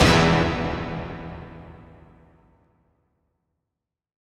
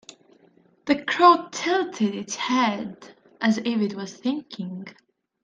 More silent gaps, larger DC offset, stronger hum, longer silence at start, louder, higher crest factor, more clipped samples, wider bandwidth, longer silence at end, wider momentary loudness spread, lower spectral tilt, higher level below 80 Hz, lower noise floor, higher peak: neither; neither; neither; second, 0 s vs 0.85 s; about the same, -22 LUFS vs -23 LUFS; about the same, 22 dB vs 22 dB; neither; first, 14 kHz vs 9.6 kHz; first, 2.65 s vs 0.55 s; first, 26 LU vs 18 LU; about the same, -5 dB/octave vs -4.5 dB/octave; first, -38 dBFS vs -70 dBFS; first, -85 dBFS vs -59 dBFS; about the same, -4 dBFS vs -2 dBFS